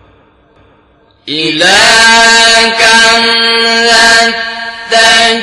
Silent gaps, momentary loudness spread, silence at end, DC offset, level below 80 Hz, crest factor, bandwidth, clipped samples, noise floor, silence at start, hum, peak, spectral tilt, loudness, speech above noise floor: none; 11 LU; 0 s; under 0.1%; -42 dBFS; 8 dB; 16 kHz; 2%; -46 dBFS; 1.25 s; none; 0 dBFS; -0.5 dB/octave; -4 LUFS; 40 dB